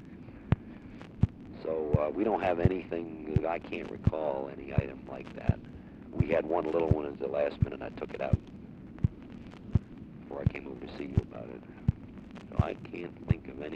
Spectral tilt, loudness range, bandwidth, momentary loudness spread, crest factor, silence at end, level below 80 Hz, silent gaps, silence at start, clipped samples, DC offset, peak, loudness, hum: -10 dB/octave; 4 LU; 6.6 kHz; 18 LU; 24 dB; 0 s; -44 dBFS; none; 0 s; under 0.1%; under 0.1%; -8 dBFS; -33 LUFS; none